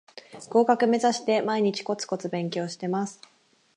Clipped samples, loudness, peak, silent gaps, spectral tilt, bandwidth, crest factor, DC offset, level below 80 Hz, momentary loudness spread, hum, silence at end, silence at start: under 0.1%; -26 LUFS; -6 dBFS; none; -5 dB/octave; 10.5 kHz; 20 dB; under 0.1%; -80 dBFS; 9 LU; none; 0.65 s; 0.15 s